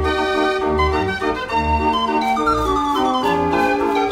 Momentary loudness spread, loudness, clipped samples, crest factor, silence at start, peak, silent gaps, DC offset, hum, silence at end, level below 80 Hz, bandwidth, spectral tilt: 3 LU; -18 LUFS; under 0.1%; 12 dB; 0 s; -6 dBFS; none; under 0.1%; none; 0 s; -32 dBFS; 16 kHz; -5.5 dB/octave